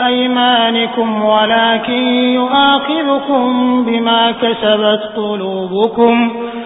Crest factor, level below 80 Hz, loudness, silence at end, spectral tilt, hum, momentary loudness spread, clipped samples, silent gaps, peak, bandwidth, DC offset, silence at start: 12 dB; -54 dBFS; -12 LUFS; 0 s; -8.5 dB/octave; none; 6 LU; under 0.1%; none; 0 dBFS; 4 kHz; under 0.1%; 0 s